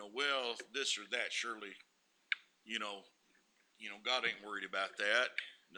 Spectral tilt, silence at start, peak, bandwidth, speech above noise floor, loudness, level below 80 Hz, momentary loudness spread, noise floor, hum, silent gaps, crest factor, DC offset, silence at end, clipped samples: 0 dB/octave; 0 s; -16 dBFS; over 20 kHz; 34 dB; -38 LUFS; under -90 dBFS; 15 LU; -73 dBFS; none; none; 24 dB; under 0.1%; 0 s; under 0.1%